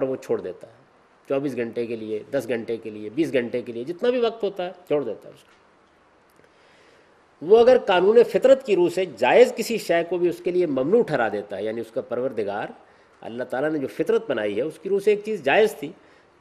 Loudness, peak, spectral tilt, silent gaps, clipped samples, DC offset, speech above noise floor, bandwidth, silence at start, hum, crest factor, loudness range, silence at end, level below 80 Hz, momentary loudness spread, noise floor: -22 LUFS; -2 dBFS; -5.5 dB/octave; none; under 0.1%; under 0.1%; 36 dB; 14.5 kHz; 0 s; none; 20 dB; 10 LU; 0.5 s; -66 dBFS; 15 LU; -58 dBFS